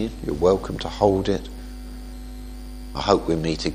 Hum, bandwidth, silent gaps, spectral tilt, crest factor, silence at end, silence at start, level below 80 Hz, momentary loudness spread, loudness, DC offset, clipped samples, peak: none; 15.5 kHz; none; -6 dB/octave; 22 dB; 0 s; 0 s; -36 dBFS; 18 LU; -23 LUFS; under 0.1%; under 0.1%; -2 dBFS